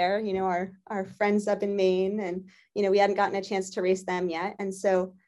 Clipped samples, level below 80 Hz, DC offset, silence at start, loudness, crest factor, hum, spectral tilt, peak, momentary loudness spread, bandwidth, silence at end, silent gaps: under 0.1%; -70 dBFS; under 0.1%; 0 s; -27 LUFS; 16 dB; none; -5.5 dB/octave; -10 dBFS; 11 LU; 11.5 kHz; 0.15 s; none